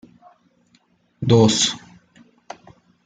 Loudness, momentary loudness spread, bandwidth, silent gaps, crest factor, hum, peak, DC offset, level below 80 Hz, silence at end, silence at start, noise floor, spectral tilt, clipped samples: -17 LUFS; 27 LU; 9.6 kHz; none; 20 dB; none; -2 dBFS; under 0.1%; -56 dBFS; 1.3 s; 1.2 s; -61 dBFS; -4.5 dB/octave; under 0.1%